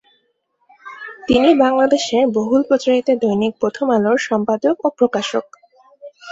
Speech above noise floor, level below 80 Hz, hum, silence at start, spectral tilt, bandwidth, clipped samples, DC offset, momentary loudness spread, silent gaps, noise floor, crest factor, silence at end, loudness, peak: 50 dB; -52 dBFS; none; 0.85 s; -5 dB/octave; 8 kHz; under 0.1%; under 0.1%; 10 LU; none; -66 dBFS; 16 dB; 0 s; -16 LUFS; -2 dBFS